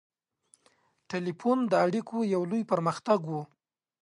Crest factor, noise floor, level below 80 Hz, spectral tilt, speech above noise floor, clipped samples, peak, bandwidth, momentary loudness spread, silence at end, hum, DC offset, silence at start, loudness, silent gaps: 18 dB; -68 dBFS; -78 dBFS; -7 dB/octave; 40 dB; under 0.1%; -12 dBFS; 11.5 kHz; 11 LU; 0.55 s; none; under 0.1%; 1.1 s; -29 LUFS; none